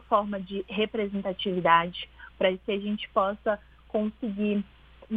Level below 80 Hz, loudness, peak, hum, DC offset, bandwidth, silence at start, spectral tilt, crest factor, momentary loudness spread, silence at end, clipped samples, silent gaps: -56 dBFS; -28 LUFS; -6 dBFS; none; under 0.1%; 4.8 kHz; 0.1 s; -8.5 dB/octave; 22 dB; 11 LU; 0 s; under 0.1%; none